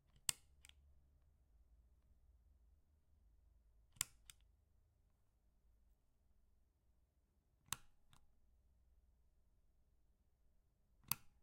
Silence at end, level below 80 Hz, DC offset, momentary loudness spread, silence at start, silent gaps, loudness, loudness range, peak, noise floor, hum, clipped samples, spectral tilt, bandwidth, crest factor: 0.15 s; -74 dBFS; under 0.1%; 23 LU; 0.15 s; none; -47 LUFS; 5 LU; -12 dBFS; -80 dBFS; none; under 0.1%; 0 dB/octave; 14 kHz; 46 dB